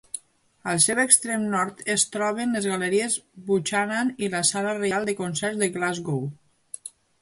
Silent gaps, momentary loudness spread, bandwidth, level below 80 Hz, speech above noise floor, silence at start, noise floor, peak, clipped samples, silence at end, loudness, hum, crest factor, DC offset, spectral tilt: none; 18 LU; 11.5 kHz; -68 dBFS; 24 dB; 0.15 s; -49 dBFS; -2 dBFS; under 0.1%; 0.35 s; -23 LUFS; none; 24 dB; under 0.1%; -3 dB/octave